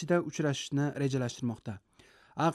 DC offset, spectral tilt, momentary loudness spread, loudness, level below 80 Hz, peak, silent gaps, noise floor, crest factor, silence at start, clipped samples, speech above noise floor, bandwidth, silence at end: under 0.1%; -6 dB/octave; 14 LU; -33 LUFS; -68 dBFS; -16 dBFS; none; -61 dBFS; 16 dB; 0 s; under 0.1%; 29 dB; 12.5 kHz; 0 s